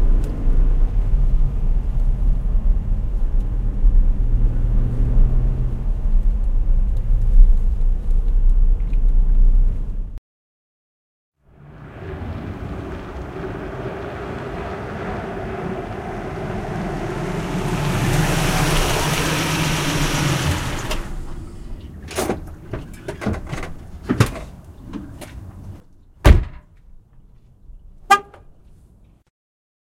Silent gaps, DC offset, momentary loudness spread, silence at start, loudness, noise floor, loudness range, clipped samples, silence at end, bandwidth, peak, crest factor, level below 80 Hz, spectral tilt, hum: 10.18-11.32 s; under 0.1%; 16 LU; 0 s; -22 LUFS; -50 dBFS; 9 LU; under 0.1%; 1.75 s; 14.5 kHz; 0 dBFS; 18 dB; -20 dBFS; -5 dB/octave; none